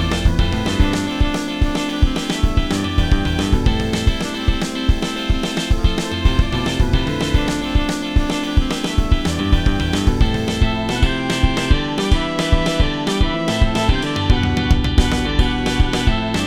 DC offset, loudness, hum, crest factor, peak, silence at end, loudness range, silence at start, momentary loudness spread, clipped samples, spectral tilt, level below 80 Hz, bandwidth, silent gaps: 0.2%; -19 LUFS; none; 16 dB; 0 dBFS; 0 s; 2 LU; 0 s; 3 LU; under 0.1%; -5.5 dB/octave; -20 dBFS; 15.5 kHz; none